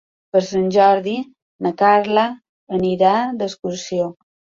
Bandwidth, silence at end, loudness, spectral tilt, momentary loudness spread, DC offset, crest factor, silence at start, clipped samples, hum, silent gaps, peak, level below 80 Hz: 7.6 kHz; 0.45 s; -18 LUFS; -5.5 dB/octave; 13 LU; under 0.1%; 16 dB; 0.35 s; under 0.1%; none; 1.42-1.59 s, 2.49-2.67 s; -2 dBFS; -60 dBFS